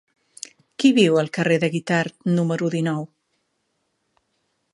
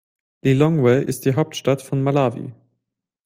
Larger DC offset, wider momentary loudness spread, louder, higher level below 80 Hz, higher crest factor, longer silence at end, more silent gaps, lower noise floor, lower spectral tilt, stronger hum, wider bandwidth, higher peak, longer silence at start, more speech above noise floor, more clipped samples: neither; first, 21 LU vs 8 LU; about the same, -20 LUFS vs -19 LUFS; second, -68 dBFS vs -56 dBFS; about the same, 20 dB vs 18 dB; first, 1.7 s vs 0.75 s; neither; second, -72 dBFS vs -80 dBFS; about the same, -6 dB/octave vs -7 dB/octave; neither; second, 11.5 kHz vs 16 kHz; about the same, -4 dBFS vs -2 dBFS; first, 0.8 s vs 0.45 s; second, 53 dB vs 61 dB; neither